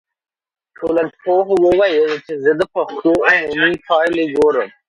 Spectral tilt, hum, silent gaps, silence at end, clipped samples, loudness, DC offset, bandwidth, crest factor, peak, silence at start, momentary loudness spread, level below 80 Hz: -5.5 dB/octave; none; none; 0.2 s; under 0.1%; -15 LUFS; under 0.1%; 11 kHz; 14 dB; -2 dBFS; 0.8 s; 6 LU; -52 dBFS